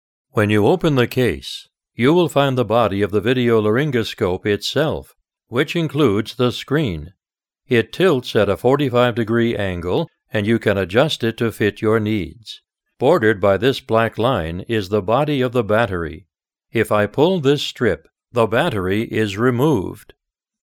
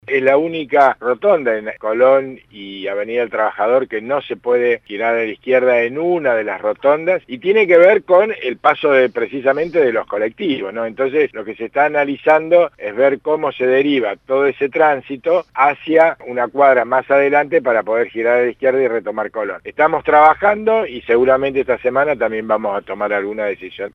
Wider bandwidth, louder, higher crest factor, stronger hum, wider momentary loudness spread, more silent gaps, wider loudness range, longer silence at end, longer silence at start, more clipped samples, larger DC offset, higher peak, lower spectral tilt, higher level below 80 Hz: first, 17.5 kHz vs 6 kHz; about the same, -18 LUFS vs -16 LUFS; about the same, 18 dB vs 16 dB; neither; about the same, 9 LU vs 9 LU; neither; about the same, 2 LU vs 3 LU; first, 0.7 s vs 0.05 s; first, 0.35 s vs 0.1 s; neither; neither; about the same, -2 dBFS vs 0 dBFS; about the same, -6.5 dB/octave vs -7 dB/octave; first, -46 dBFS vs -56 dBFS